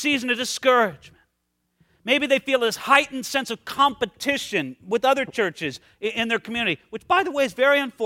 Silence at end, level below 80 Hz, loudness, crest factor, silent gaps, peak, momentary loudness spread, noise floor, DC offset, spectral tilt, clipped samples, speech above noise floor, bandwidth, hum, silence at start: 0 s; -62 dBFS; -22 LUFS; 22 dB; none; -2 dBFS; 9 LU; -74 dBFS; under 0.1%; -3 dB/octave; under 0.1%; 52 dB; 16.5 kHz; none; 0 s